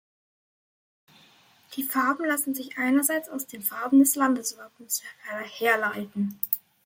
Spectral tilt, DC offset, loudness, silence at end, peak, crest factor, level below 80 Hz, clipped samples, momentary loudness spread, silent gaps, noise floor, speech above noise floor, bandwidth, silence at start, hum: -3 dB/octave; under 0.1%; -26 LUFS; 0.3 s; -4 dBFS; 24 dB; -78 dBFS; under 0.1%; 15 LU; none; -58 dBFS; 32 dB; 17 kHz; 1.7 s; none